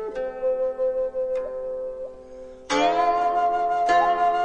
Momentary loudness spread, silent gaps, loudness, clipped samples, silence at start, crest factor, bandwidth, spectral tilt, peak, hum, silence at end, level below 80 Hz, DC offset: 17 LU; none; -23 LUFS; under 0.1%; 0 s; 16 dB; 9.2 kHz; -3.5 dB/octave; -8 dBFS; none; 0 s; -54 dBFS; under 0.1%